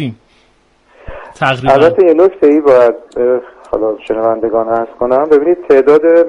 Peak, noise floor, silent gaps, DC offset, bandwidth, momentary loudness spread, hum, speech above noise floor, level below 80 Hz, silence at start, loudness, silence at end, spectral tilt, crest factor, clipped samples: 0 dBFS; -51 dBFS; none; under 0.1%; 8.6 kHz; 9 LU; none; 42 dB; -44 dBFS; 0 s; -11 LUFS; 0 s; -7.5 dB/octave; 10 dB; 0.1%